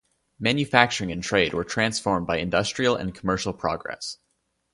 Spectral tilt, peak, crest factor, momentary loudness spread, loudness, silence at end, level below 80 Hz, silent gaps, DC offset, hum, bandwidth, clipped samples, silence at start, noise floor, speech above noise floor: -4 dB/octave; 0 dBFS; 26 dB; 11 LU; -24 LUFS; 0.6 s; -50 dBFS; none; under 0.1%; none; 11.5 kHz; under 0.1%; 0.4 s; -73 dBFS; 49 dB